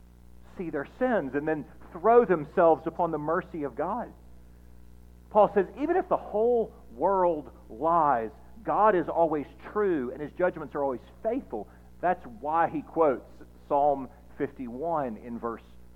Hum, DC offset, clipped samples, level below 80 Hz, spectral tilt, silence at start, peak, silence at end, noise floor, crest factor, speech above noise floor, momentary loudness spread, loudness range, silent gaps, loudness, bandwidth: 60 Hz at -50 dBFS; under 0.1%; under 0.1%; -54 dBFS; -8.5 dB/octave; 0.55 s; -8 dBFS; 0.1 s; -51 dBFS; 20 dB; 24 dB; 13 LU; 4 LU; none; -28 LUFS; 6 kHz